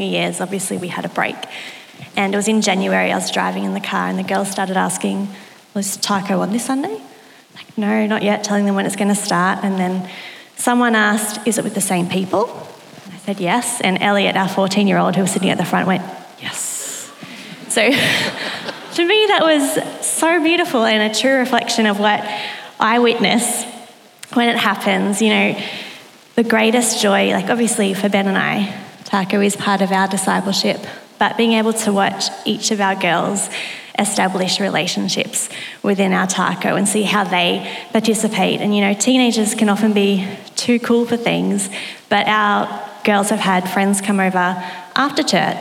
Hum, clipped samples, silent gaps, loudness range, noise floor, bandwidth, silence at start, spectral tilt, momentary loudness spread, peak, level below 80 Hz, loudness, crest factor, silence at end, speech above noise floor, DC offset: none; under 0.1%; none; 4 LU; -40 dBFS; 16.5 kHz; 0 s; -3.5 dB/octave; 11 LU; 0 dBFS; -76 dBFS; -17 LUFS; 18 dB; 0 s; 23 dB; under 0.1%